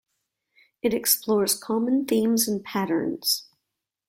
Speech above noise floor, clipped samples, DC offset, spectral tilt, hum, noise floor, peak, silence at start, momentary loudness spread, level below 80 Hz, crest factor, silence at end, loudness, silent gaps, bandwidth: 59 dB; under 0.1%; under 0.1%; -3 dB/octave; none; -83 dBFS; -4 dBFS; 0.85 s; 6 LU; -66 dBFS; 20 dB; 0.65 s; -24 LUFS; none; 16.5 kHz